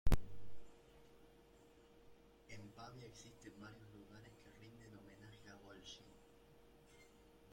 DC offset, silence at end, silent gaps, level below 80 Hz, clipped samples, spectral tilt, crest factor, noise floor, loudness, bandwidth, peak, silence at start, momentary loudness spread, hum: under 0.1%; 1.6 s; none; -50 dBFS; under 0.1%; -5.5 dB/octave; 22 dB; -67 dBFS; -55 LUFS; 16.5 kHz; -22 dBFS; 0.05 s; 11 LU; none